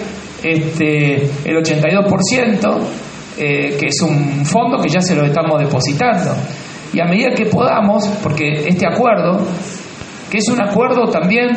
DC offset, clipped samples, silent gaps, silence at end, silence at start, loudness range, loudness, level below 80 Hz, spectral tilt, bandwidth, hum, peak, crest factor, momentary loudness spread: under 0.1%; under 0.1%; none; 0 s; 0 s; 1 LU; -14 LUFS; -50 dBFS; -5.5 dB/octave; 8.8 kHz; none; -2 dBFS; 14 dB; 9 LU